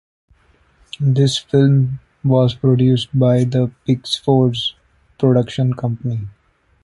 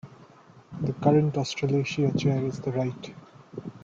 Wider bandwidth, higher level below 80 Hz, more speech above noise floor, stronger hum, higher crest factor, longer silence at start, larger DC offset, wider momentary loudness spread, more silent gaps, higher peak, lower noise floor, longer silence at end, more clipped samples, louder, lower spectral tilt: first, 11.5 kHz vs 7.6 kHz; first, -50 dBFS vs -60 dBFS; first, 39 dB vs 27 dB; neither; about the same, 16 dB vs 20 dB; first, 1 s vs 0.05 s; neither; second, 9 LU vs 19 LU; neither; first, -2 dBFS vs -8 dBFS; about the same, -54 dBFS vs -53 dBFS; first, 0.55 s vs 0.05 s; neither; first, -17 LUFS vs -26 LUFS; about the same, -7.5 dB/octave vs -7 dB/octave